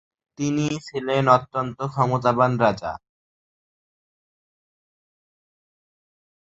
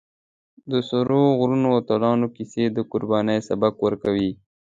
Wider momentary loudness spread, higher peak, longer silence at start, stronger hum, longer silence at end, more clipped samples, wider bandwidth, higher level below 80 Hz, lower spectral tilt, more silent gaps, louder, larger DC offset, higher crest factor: first, 11 LU vs 7 LU; first, -2 dBFS vs -6 dBFS; second, 0.4 s vs 0.65 s; neither; first, 3.5 s vs 0.35 s; neither; about the same, 8 kHz vs 7.8 kHz; about the same, -58 dBFS vs -58 dBFS; about the same, -6.5 dB/octave vs -7.5 dB/octave; neither; about the same, -22 LUFS vs -22 LUFS; neither; first, 24 dB vs 16 dB